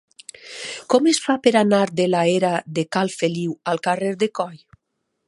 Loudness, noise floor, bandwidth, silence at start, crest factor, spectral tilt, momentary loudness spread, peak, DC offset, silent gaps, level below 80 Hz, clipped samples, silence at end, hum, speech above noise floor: -20 LUFS; -75 dBFS; 11.5 kHz; 0.45 s; 20 dB; -5 dB/octave; 14 LU; -2 dBFS; under 0.1%; none; -68 dBFS; under 0.1%; 0.7 s; none; 56 dB